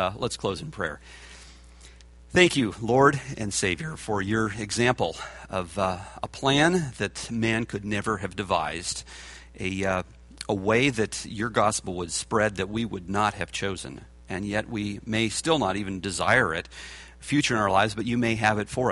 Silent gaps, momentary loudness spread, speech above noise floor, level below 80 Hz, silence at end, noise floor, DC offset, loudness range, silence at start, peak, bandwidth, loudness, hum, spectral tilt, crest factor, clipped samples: none; 15 LU; 23 dB; -50 dBFS; 0 s; -49 dBFS; under 0.1%; 4 LU; 0 s; -2 dBFS; 11.5 kHz; -26 LUFS; none; -4.5 dB/octave; 24 dB; under 0.1%